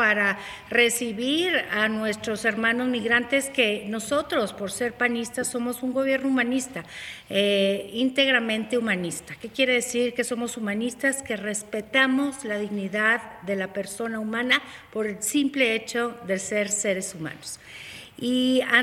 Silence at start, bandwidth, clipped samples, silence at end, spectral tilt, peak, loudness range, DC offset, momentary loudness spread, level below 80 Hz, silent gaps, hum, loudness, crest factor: 0 s; 16 kHz; under 0.1%; 0 s; -3 dB/octave; -6 dBFS; 3 LU; under 0.1%; 11 LU; -62 dBFS; none; none; -24 LUFS; 20 dB